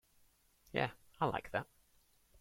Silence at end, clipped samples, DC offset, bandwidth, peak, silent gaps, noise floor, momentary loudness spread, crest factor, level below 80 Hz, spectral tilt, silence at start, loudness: 0.75 s; under 0.1%; under 0.1%; 16.5 kHz; -18 dBFS; none; -71 dBFS; 5 LU; 24 dB; -66 dBFS; -6 dB/octave; 0.75 s; -40 LUFS